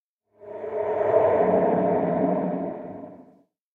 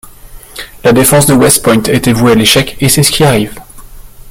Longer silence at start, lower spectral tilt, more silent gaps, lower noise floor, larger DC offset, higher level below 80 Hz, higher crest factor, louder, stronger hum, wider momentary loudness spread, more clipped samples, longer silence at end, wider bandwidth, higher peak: first, 0.4 s vs 0.05 s; first, -10.5 dB/octave vs -4 dB/octave; neither; first, -58 dBFS vs -31 dBFS; neither; second, -62 dBFS vs -32 dBFS; first, 18 dB vs 10 dB; second, -23 LUFS vs -7 LUFS; neither; first, 19 LU vs 13 LU; second, under 0.1% vs 0.2%; first, 0.55 s vs 0 s; second, 3.9 kHz vs over 20 kHz; second, -8 dBFS vs 0 dBFS